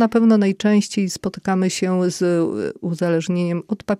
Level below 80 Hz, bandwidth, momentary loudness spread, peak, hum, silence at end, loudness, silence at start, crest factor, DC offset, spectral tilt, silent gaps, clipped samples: -58 dBFS; 13 kHz; 9 LU; -6 dBFS; none; 0 s; -19 LUFS; 0 s; 14 dB; under 0.1%; -6 dB/octave; none; under 0.1%